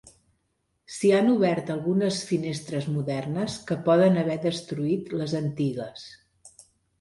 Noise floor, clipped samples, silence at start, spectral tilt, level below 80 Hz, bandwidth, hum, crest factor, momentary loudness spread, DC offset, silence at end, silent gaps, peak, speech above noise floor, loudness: -75 dBFS; under 0.1%; 0.05 s; -6.5 dB/octave; -64 dBFS; 11.5 kHz; none; 16 dB; 10 LU; under 0.1%; 0.55 s; none; -10 dBFS; 50 dB; -25 LUFS